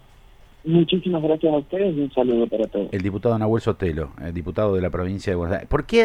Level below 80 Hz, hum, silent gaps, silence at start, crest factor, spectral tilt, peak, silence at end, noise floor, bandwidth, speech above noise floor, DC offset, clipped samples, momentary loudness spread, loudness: -40 dBFS; none; none; 0.65 s; 18 dB; -7.5 dB/octave; -4 dBFS; 0 s; -48 dBFS; 10.5 kHz; 27 dB; under 0.1%; under 0.1%; 6 LU; -22 LUFS